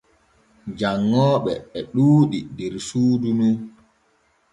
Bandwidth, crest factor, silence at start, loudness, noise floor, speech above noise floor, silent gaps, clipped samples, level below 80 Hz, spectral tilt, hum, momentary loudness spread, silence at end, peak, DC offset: 11.5 kHz; 16 dB; 0.65 s; -20 LUFS; -63 dBFS; 43 dB; none; under 0.1%; -56 dBFS; -7.5 dB/octave; none; 14 LU; 0.85 s; -6 dBFS; under 0.1%